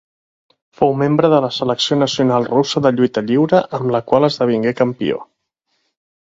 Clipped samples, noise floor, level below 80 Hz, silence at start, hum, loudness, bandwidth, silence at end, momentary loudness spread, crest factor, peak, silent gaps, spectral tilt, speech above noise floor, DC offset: under 0.1%; -70 dBFS; -56 dBFS; 0.8 s; none; -16 LUFS; 7.8 kHz; 1.15 s; 5 LU; 16 dB; 0 dBFS; none; -6 dB/octave; 54 dB; under 0.1%